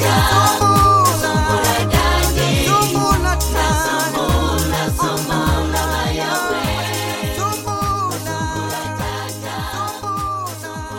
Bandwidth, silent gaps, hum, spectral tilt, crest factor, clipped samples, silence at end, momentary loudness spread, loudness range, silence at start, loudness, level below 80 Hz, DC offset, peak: 17 kHz; none; none; -4 dB/octave; 16 dB; under 0.1%; 0 s; 10 LU; 8 LU; 0 s; -17 LUFS; -26 dBFS; under 0.1%; 0 dBFS